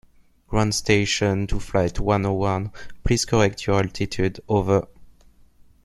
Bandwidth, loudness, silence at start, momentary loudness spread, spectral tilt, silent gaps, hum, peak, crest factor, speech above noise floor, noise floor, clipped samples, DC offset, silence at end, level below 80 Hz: 12.5 kHz; -22 LUFS; 0.5 s; 7 LU; -5 dB/octave; none; none; -2 dBFS; 20 dB; 31 dB; -52 dBFS; under 0.1%; under 0.1%; 0.75 s; -36 dBFS